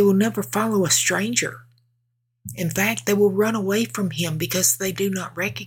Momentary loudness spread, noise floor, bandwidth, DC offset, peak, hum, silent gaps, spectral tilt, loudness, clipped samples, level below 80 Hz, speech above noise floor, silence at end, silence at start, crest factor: 8 LU; -72 dBFS; 18 kHz; under 0.1%; -4 dBFS; none; none; -3.5 dB/octave; -21 LUFS; under 0.1%; -60 dBFS; 51 dB; 0 s; 0 s; 18 dB